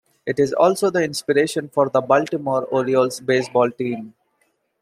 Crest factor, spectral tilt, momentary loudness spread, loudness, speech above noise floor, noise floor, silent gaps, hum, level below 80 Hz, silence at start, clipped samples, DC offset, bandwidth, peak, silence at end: 18 dB; -5 dB/octave; 6 LU; -20 LUFS; 48 dB; -67 dBFS; none; none; -66 dBFS; 0.25 s; under 0.1%; under 0.1%; 15 kHz; -2 dBFS; 0.7 s